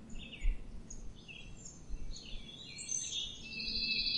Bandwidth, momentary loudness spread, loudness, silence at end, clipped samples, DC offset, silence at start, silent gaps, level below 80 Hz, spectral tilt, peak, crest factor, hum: 10.5 kHz; 16 LU; -40 LUFS; 0 s; under 0.1%; 0.1%; 0 s; none; -44 dBFS; -1 dB/octave; -20 dBFS; 20 dB; none